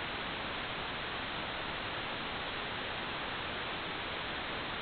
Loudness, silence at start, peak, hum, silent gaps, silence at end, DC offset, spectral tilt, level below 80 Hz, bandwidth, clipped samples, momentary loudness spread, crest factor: -38 LUFS; 0 s; -26 dBFS; none; none; 0 s; under 0.1%; -1 dB/octave; -56 dBFS; 4.9 kHz; under 0.1%; 0 LU; 12 dB